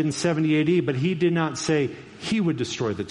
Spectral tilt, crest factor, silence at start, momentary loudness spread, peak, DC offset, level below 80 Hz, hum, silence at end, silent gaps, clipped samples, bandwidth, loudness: -5.5 dB/octave; 14 dB; 0 s; 6 LU; -8 dBFS; under 0.1%; -60 dBFS; none; 0 s; none; under 0.1%; 11.5 kHz; -24 LUFS